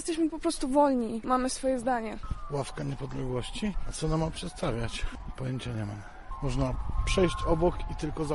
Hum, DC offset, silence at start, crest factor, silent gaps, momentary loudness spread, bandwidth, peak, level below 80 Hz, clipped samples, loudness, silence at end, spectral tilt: none; under 0.1%; 0 s; 18 dB; none; 10 LU; 11.5 kHz; -12 dBFS; -38 dBFS; under 0.1%; -31 LUFS; 0 s; -5.5 dB/octave